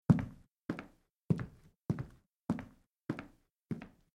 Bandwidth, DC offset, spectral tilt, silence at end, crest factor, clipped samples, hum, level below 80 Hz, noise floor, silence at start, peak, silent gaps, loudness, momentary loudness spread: 11.5 kHz; under 0.1%; -9 dB/octave; 0.25 s; 26 dB; under 0.1%; none; -62 dBFS; -61 dBFS; 0.1 s; -12 dBFS; 0.51-0.68 s, 1.10-1.29 s, 1.81-1.85 s, 2.35-2.39 s, 3.02-3.08 s, 3.50-3.54 s; -40 LUFS; 14 LU